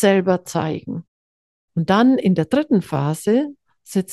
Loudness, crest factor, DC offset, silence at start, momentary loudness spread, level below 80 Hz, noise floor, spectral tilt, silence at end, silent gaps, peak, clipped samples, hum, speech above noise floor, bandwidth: -19 LUFS; 16 dB; under 0.1%; 0 s; 13 LU; -60 dBFS; under -90 dBFS; -6.5 dB/octave; 0 s; 1.08-1.68 s; -4 dBFS; under 0.1%; none; over 72 dB; 12.5 kHz